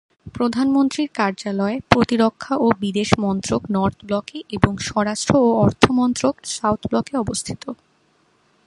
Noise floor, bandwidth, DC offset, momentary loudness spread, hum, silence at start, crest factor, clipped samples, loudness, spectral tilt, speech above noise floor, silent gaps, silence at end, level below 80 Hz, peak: -61 dBFS; 11.5 kHz; under 0.1%; 9 LU; none; 0.25 s; 20 dB; under 0.1%; -20 LUFS; -5.5 dB/octave; 41 dB; none; 0.9 s; -42 dBFS; 0 dBFS